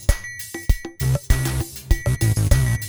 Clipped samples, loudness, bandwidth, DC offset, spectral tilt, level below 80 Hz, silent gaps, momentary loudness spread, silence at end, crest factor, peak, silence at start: under 0.1%; -22 LUFS; over 20 kHz; under 0.1%; -5 dB/octave; -24 dBFS; none; 9 LU; 0 s; 18 dB; -2 dBFS; 0 s